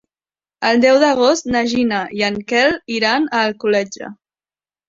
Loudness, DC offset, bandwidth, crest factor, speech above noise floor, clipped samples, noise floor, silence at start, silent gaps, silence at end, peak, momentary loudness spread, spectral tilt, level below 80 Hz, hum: -16 LUFS; under 0.1%; 7.8 kHz; 16 dB; over 74 dB; under 0.1%; under -90 dBFS; 0.6 s; none; 0.75 s; -2 dBFS; 8 LU; -3.5 dB/octave; -54 dBFS; none